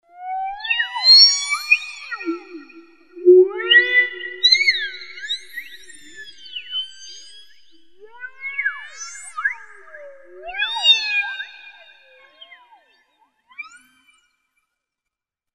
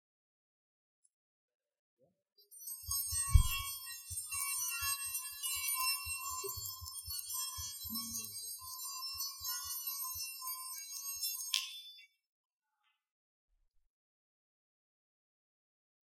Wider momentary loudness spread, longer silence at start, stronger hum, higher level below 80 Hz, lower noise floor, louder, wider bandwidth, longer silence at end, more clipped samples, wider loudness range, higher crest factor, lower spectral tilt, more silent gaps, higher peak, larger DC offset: first, 25 LU vs 10 LU; second, 0.2 s vs 2.5 s; neither; second, -66 dBFS vs -46 dBFS; about the same, -85 dBFS vs -82 dBFS; first, -16 LUFS vs -38 LUFS; second, 12.5 kHz vs 16.5 kHz; second, 1.85 s vs 4.1 s; neither; first, 15 LU vs 7 LU; second, 20 dB vs 32 dB; second, 1 dB/octave vs -1 dB/octave; neither; first, 0 dBFS vs -10 dBFS; neither